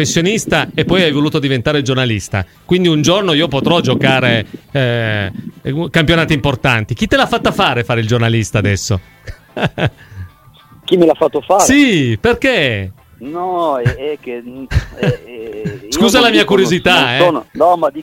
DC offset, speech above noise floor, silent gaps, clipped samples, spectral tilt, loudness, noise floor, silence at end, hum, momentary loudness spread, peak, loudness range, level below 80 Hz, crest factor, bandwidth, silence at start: under 0.1%; 30 dB; none; under 0.1%; -5 dB/octave; -13 LUFS; -43 dBFS; 0 s; none; 13 LU; 0 dBFS; 4 LU; -34 dBFS; 14 dB; 16.5 kHz; 0 s